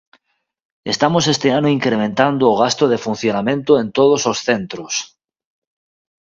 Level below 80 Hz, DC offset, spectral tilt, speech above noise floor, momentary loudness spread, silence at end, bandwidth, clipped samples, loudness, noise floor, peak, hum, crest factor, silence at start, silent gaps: -56 dBFS; under 0.1%; -4.5 dB/octave; 54 dB; 9 LU; 1.15 s; 7.6 kHz; under 0.1%; -16 LUFS; -69 dBFS; 0 dBFS; none; 18 dB; 0.85 s; none